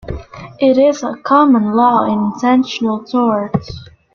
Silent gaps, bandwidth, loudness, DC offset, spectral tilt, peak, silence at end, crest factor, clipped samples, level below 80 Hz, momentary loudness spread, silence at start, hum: none; 7 kHz; -14 LUFS; under 0.1%; -6.5 dB/octave; -2 dBFS; 0.3 s; 12 dB; under 0.1%; -42 dBFS; 17 LU; 0.05 s; none